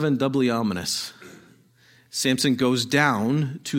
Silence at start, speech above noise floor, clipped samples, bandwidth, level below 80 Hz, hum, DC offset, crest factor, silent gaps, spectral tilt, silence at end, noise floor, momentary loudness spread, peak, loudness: 0 s; 34 dB; under 0.1%; 16.5 kHz; -62 dBFS; none; under 0.1%; 20 dB; none; -4.5 dB/octave; 0 s; -57 dBFS; 7 LU; -4 dBFS; -23 LUFS